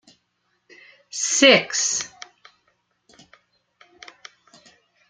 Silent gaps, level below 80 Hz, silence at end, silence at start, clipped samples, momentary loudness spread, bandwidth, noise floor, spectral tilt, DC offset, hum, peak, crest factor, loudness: none; -70 dBFS; 3.05 s; 1.15 s; under 0.1%; 29 LU; 10.5 kHz; -71 dBFS; -1 dB/octave; under 0.1%; none; -2 dBFS; 24 dB; -17 LUFS